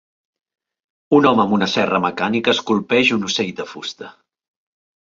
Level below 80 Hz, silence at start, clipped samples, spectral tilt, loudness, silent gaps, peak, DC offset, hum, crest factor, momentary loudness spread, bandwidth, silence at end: -60 dBFS; 1.1 s; under 0.1%; -4.5 dB/octave; -17 LUFS; none; -2 dBFS; under 0.1%; none; 18 dB; 14 LU; 7.8 kHz; 0.95 s